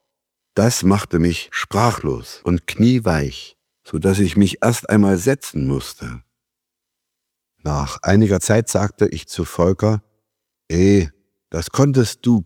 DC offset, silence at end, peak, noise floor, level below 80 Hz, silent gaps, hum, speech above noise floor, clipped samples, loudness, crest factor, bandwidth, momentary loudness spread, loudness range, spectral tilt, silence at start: under 0.1%; 0 s; 0 dBFS; -82 dBFS; -38 dBFS; none; none; 65 dB; under 0.1%; -18 LUFS; 18 dB; 17 kHz; 12 LU; 3 LU; -6 dB/octave; 0.55 s